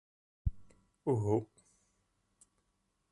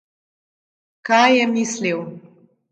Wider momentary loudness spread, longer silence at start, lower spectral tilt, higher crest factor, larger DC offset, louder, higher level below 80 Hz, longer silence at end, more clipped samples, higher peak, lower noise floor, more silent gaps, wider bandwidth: second, 10 LU vs 19 LU; second, 0.45 s vs 1.05 s; first, -9.5 dB/octave vs -3.5 dB/octave; about the same, 22 dB vs 20 dB; neither; second, -36 LUFS vs -17 LUFS; first, -50 dBFS vs -74 dBFS; first, 1.65 s vs 0.5 s; neither; second, -18 dBFS vs 0 dBFS; first, -80 dBFS vs -51 dBFS; neither; first, 11.5 kHz vs 9 kHz